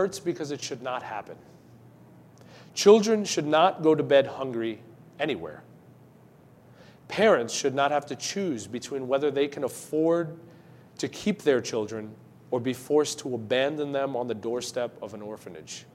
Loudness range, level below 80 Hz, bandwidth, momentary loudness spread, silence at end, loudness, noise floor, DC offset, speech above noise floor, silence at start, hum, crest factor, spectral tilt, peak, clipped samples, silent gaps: 6 LU; -72 dBFS; 14.5 kHz; 17 LU; 0.1 s; -26 LUFS; -54 dBFS; under 0.1%; 28 dB; 0 s; none; 22 dB; -4.5 dB/octave; -4 dBFS; under 0.1%; none